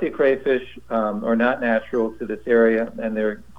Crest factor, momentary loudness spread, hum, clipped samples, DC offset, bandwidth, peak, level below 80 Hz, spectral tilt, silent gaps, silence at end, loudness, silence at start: 16 dB; 8 LU; none; under 0.1%; 0.7%; 6.6 kHz; -4 dBFS; -52 dBFS; -7.5 dB/octave; none; 0.2 s; -21 LUFS; 0 s